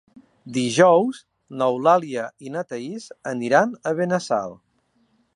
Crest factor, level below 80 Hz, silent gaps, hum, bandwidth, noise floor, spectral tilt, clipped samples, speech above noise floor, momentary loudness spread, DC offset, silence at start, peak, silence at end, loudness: 20 dB; -72 dBFS; none; none; 11.5 kHz; -65 dBFS; -5 dB/octave; under 0.1%; 45 dB; 17 LU; under 0.1%; 0.45 s; -2 dBFS; 0.8 s; -21 LUFS